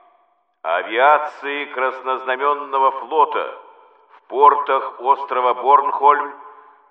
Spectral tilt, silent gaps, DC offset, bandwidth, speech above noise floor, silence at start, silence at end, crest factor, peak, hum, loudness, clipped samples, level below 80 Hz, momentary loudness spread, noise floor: -4 dB/octave; none; under 0.1%; 5.8 kHz; 43 dB; 0.65 s; 0.4 s; 18 dB; 0 dBFS; none; -18 LUFS; under 0.1%; -84 dBFS; 11 LU; -61 dBFS